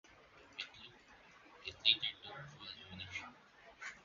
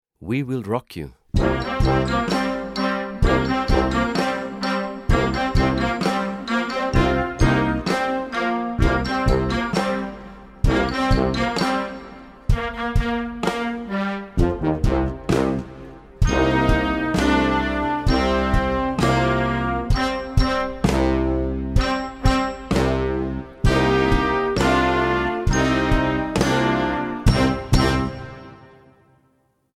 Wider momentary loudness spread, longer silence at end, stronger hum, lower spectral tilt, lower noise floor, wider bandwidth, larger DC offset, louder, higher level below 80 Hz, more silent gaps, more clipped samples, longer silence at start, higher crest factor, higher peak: first, 28 LU vs 7 LU; second, 0 s vs 1.1 s; neither; second, 1 dB/octave vs -6 dB/octave; about the same, -63 dBFS vs -64 dBFS; second, 7.4 kHz vs 14.5 kHz; neither; second, -39 LUFS vs -21 LUFS; second, -72 dBFS vs -28 dBFS; neither; neither; second, 0.05 s vs 0.2 s; first, 32 dB vs 18 dB; second, -14 dBFS vs -2 dBFS